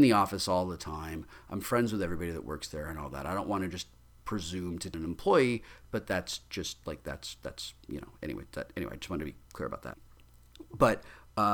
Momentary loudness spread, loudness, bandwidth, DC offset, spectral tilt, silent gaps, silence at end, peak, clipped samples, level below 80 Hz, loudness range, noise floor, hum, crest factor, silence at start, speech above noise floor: 15 LU; -34 LUFS; 19.5 kHz; under 0.1%; -5 dB/octave; none; 0 s; -12 dBFS; under 0.1%; -52 dBFS; 7 LU; -57 dBFS; none; 22 dB; 0 s; 24 dB